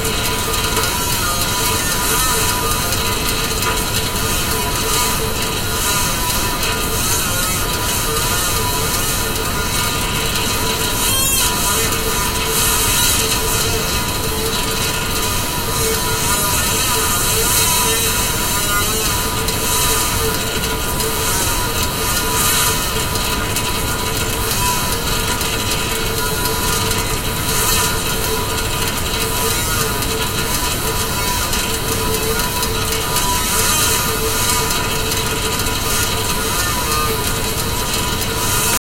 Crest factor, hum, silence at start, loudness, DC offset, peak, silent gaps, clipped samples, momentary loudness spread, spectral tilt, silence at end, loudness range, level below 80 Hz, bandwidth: 16 dB; none; 0 s; -16 LUFS; under 0.1%; 0 dBFS; none; under 0.1%; 4 LU; -2 dB/octave; 0.05 s; 3 LU; -26 dBFS; 16 kHz